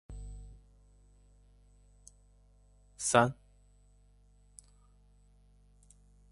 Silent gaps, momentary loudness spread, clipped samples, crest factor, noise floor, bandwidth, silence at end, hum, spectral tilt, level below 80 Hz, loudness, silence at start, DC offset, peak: none; 30 LU; under 0.1%; 30 dB; -63 dBFS; 11.5 kHz; 3 s; 50 Hz at -60 dBFS; -4 dB/octave; -56 dBFS; -30 LUFS; 0.1 s; under 0.1%; -10 dBFS